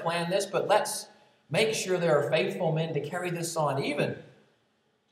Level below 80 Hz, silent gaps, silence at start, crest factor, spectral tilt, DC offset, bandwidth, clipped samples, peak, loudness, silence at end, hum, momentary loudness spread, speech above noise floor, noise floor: -82 dBFS; none; 0 s; 18 dB; -4.5 dB/octave; under 0.1%; 15.5 kHz; under 0.1%; -10 dBFS; -28 LUFS; 0.85 s; none; 7 LU; 43 dB; -71 dBFS